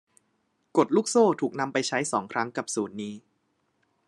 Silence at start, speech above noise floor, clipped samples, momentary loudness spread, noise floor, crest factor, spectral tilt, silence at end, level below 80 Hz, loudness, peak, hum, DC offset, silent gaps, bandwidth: 0.75 s; 47 dB; under 0.1%; 13 LU; -73 dBFS; 20 dB; -4 dB/octave; 0.9 s; -80 dBFS; -26 LUFS; -8 dBFS; none; under 0.1%; none; 12 kHz